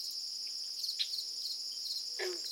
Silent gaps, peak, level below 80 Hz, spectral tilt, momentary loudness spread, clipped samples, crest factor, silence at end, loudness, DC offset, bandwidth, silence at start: none; -20 dBFS; under -90 dBFS; 2.5 dB/octave; 3 LU; under 0.1%; 20 dB; 0 s; -36 LUFS; under 0.1%; 16.5 kHz; 0 s